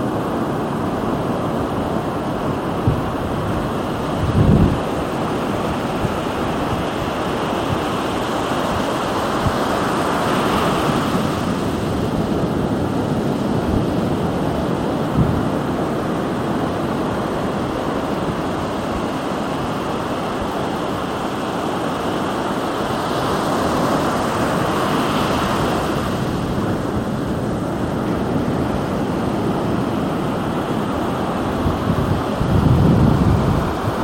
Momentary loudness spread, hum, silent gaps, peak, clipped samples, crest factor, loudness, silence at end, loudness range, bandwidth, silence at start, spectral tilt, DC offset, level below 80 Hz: 5 LU; none; none; -2 dBFS; under 0.1%; 16 dB; -20 LUFS; 0 s; 3 LU; 16.5 kHz; 0 s; -6.5 dB/octave; under 0.1%; -34 dBFS